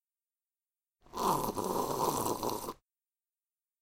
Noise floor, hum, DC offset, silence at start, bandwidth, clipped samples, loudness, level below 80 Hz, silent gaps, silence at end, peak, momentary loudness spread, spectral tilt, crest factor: under -90 dBFS; none; under 0.1%; 1.15 s; 17 kHz; under 0.1%; -34 LUFS; -60 dBFS; none; 1.1 s; -16 dBFS; 13 LU; -4 dB/octave; 20 dB